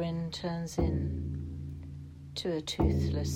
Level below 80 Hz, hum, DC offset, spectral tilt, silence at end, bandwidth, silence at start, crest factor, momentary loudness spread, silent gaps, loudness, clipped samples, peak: -44 dBFS; none; under 0.1%; -6.5 dB/octave; 0 s; 15.5 kHz; 0 s; 18 dB; 14 LU; none; -34 LUFS; under 0.1%; -14 dBFS